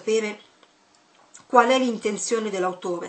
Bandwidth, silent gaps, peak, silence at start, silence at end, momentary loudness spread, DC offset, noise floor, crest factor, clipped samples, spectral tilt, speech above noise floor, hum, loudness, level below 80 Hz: 9 kHz; none; -2 dBFS; 0 s; 0 s; 10 LU; under 0.1%; -59 dBFS; 22 dB; under 0.1%; -3.5 dB/octave; 37 dB; none; -22 LUFS; -78 dBFS